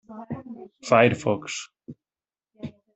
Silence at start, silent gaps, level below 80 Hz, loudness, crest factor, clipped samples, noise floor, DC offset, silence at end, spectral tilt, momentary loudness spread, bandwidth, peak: 0.1 s; none; -62 dBFS; -22 LUFS; 24 dB; under 0.1%; under -90 dBFS; under 0.1%; 0.25 s; -5 dB/octave; 22 LU; 8.4 kHz; -2 dBFS